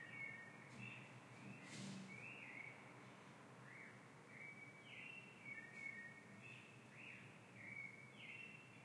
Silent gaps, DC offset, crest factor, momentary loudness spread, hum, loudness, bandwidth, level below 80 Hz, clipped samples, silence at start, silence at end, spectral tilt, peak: none; under 0.1%; 16 dB; 8 LU; none; -56 LUFS; 11.5 kHz; under -90 dBFS; under 0.1%; 0 s; 0 s; -4.5 dB/octave; -42 dBFS